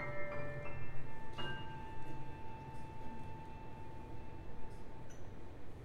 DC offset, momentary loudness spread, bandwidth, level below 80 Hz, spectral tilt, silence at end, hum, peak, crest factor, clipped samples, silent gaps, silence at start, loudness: under 0.1%; 9 LU; 9 kHz; -54 dBFS; -6 dB/octave; 0 s; none; -26 dBFS; 14 dB; under 0.1%; none; 0 s; -49 LUFS